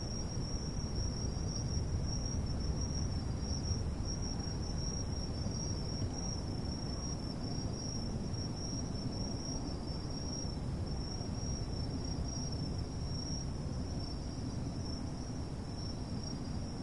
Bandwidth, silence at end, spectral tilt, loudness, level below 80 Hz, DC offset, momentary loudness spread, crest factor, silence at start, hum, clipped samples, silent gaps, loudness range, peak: 11.5 kHz; 0 s; -5.5 dB/octave; -39 LUFS; -44 dBFS; 0.2%; 4 LU; 14 dB; 0 s; none; under 0.1%; none; 2 LU; -22 dBFS